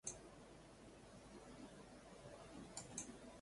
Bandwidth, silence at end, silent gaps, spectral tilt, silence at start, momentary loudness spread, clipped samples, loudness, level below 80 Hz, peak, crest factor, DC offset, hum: 11.5 kHz; 0 s; none; -3 dB/octave; 0.05 s; 10 LU; under 0.1%; -57 LUFS; -72 dBFS; -32 dBFS; 24 dB; under 0.1%; none